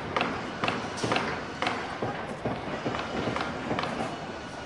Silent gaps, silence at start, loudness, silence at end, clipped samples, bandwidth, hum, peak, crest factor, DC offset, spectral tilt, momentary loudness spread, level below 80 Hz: none; 0 s; -31 LUFS; 0 s; under 0.1%; 11.5 kHz; none; -10 dBFS; 22 dB; under 0.1%; -4.5 dB/octave; 5 LU; -54 dBFS